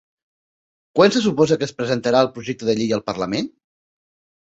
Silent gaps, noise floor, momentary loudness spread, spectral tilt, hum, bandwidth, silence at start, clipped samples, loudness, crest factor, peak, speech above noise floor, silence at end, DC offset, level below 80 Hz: none; under -90 dBFS; 10 LU; -5.5 dB/octave; none; 8.2 kHz; 0.95 s; under 0.1%; -19 LUFS; 20 dB; -2 dBFS; over 71 dB; 0.95 s; under 0.1%; -58 dBFS